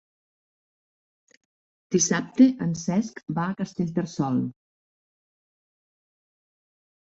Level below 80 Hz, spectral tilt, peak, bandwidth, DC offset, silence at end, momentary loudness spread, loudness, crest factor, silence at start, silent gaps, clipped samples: -66 dBFS; -5 dB/octave; -6 dBFS; 7.8 kHz; under 0.1%; 2.5 s; 10 LU; -25 LUFS; 22 dB; 1.9 s; none; under 0.1%